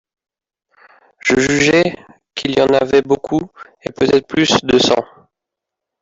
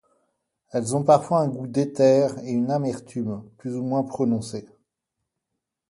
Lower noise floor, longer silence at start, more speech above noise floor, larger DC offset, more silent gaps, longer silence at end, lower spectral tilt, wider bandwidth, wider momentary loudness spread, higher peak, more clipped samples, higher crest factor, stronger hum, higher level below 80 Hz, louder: about the same, -82 dBFS vs -83 dBFS; first, 1.25 s vs 0.75 s; first, 68 dB vs 60 dB; neither; neither; second, 0.95 s vs 1.25 s; second, -4 dB/octave vs -7 dB/octave; second, 8 kHz vs 11.5 kHz; first, 17 LU vs 13 LU; about the same, -2 dBFS vs -4 dBFS; neither; second, 14 dB vs 20 dB; neither; first, -48 dBFS vs -64 dBFS; first, -14 LUFS vs -23 LUFS